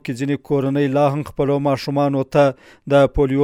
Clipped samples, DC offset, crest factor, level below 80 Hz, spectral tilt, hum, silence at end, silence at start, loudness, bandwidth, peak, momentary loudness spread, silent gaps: under 0.1%; under 0.1%; 14 dB; -38 dBFS; -7.5 dB/octave; none; 0 s; 0.05 s; -18 LUFS; 14 kHz; -4 dBFS; 6 LU; none